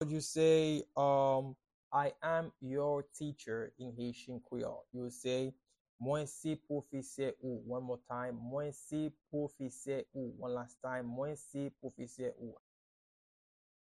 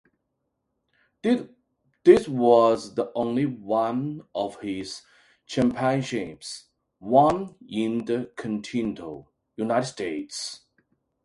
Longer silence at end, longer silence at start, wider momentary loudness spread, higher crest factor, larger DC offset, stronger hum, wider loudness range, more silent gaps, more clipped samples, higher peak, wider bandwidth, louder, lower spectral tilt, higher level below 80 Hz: first, 1.35 s vs 0.65 s; second, 0 s vs 1.25 s; second, 13 LU vs 19 LU; about the same, 20 dB vs 22 dB; neither; neither; about the same, 8 LU vs 7 LU; first, 1.74-1.91 s, 5.80-5.99 s vs none; neither; second, -18 dBFS vs -4 dBFS; first, 13 kHz vs 11.5 kHz; second, -39 LUFS vs -25 LUFS; about the same, -5.5 dB/octave vs -6 dB/octave; second, -74 dBFS vs -60 dBFS